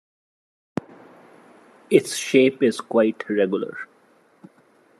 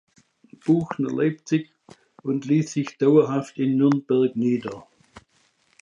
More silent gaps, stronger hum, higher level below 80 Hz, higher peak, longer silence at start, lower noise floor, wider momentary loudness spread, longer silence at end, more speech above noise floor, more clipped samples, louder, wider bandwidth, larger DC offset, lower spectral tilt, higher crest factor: neither; neither; second, -74 dBFS vs -68 dBFS; first, -2 dBFS vs -6 dBFS; first, 1.9 s vs 0.65 s; second, -58 dBFS vs -65 dBFS; first, 16 LU vs 12 LU; first, 1.15 s vs 0.65 s; second, 38 dB vs 43 dB; neither; about the same, -21 LUFS vs -22 LUFS; first, 13 kHz vs 9 kHz; neither; second, -4.5 dB/octave vs -7.5 dB/octave; about the same, 22 dB vs 18 dB